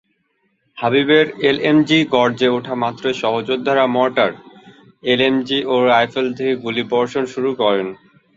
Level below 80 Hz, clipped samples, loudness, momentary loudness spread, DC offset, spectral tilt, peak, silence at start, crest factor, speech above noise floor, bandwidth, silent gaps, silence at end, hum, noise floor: -60 dBFS; under 0.1%; -17 LUFS; 7 LU; under 0.1%; -5.5 dB/octave; -2 dBFS; 0.75 s; 16 dB; 49 dB; 7.8 kHz; none; 0.45 s; none; -66 dBFS